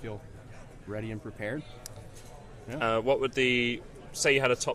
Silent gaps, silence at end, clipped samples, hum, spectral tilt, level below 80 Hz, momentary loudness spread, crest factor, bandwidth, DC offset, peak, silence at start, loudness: none; 0 s; under 0.1%; none; -3.5 dB/octave; -52 dBFS; 23 LU; 20 dB; 15 kHz; under 0.1%; -10 dBFS; 0 s; -29 LUFS